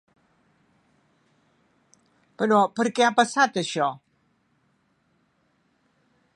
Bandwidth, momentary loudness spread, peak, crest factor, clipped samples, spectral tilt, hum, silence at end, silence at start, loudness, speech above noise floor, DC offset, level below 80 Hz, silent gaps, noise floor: 11.5 kHz; 8 LU; -4 dBFS; 24 dB; under 0.1%; -4 dB/octave; none; 2.4 s; 2.4 s; -22 LUFS; 46 dB; under 0.1%; -78 dBFS; none; -68 dBFS